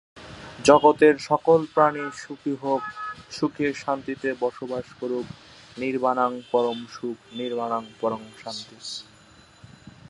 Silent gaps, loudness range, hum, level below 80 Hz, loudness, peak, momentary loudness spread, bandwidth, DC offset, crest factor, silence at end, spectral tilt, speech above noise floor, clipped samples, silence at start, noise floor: none; 8 LU; none; -62 dBFS; -24 LUFS; -2 dBFS; 17 LU; 11 kHz; under 0.1%; 24 dB; 0.2 s; -5 dB/octave; 29 dB; under 0.1%; 0.15 s; -52 dBFS